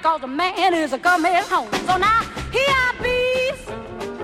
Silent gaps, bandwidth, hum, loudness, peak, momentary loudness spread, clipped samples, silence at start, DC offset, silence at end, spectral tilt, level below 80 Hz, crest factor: none; 16 kHz; none; -19 LUFS; -6 dBFS; 9 LU; under 0.1%; 0 s; under 0.1%; 0 s; -3.5 dB/octave; -42 dBFS; 14 dB